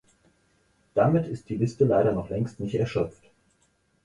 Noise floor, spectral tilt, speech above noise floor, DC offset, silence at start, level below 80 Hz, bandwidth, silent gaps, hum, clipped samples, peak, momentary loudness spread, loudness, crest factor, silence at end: -68 dBFS; -8.5 dB/octave; 43 dB; under 0.1%; 0.95 s; -54 dBFS; 11 kHz; none; none; under 0.1%; -8 dBFS; 9 LU; -26 LUFS; 18 dB; 0.95 s